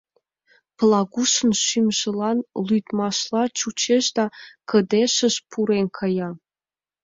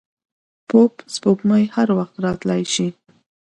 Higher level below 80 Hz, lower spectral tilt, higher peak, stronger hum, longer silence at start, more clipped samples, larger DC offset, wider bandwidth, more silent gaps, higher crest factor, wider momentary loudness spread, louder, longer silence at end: second, -64 dBFS vs -56 dBFS; second, -3.5 dB/octave vs -5.5 dB/octave; second, -6 dBFS vs 0 dBFS; neither; about the same, 0.8 s vs 0.7 s; neither; neither; second, 7.8 kHz vs 11.5 kHz; neither; about the same, 16 dB vs 18 dB; about the same, 7 LU vs 7 LU; about the same, -21 LUFS vs -19 LUFS; about the same, 0.65 s vs 0.7 s